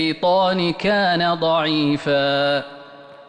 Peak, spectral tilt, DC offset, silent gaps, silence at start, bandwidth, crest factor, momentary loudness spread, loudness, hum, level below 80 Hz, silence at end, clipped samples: -8 dBFS; -6 dB/octave; under 0.1%; none; 0 s; 9.8 kHz; 10 dB; 3 LU; -19 LUFS; none; -56 dBFS; 0.05 s; under 0.1%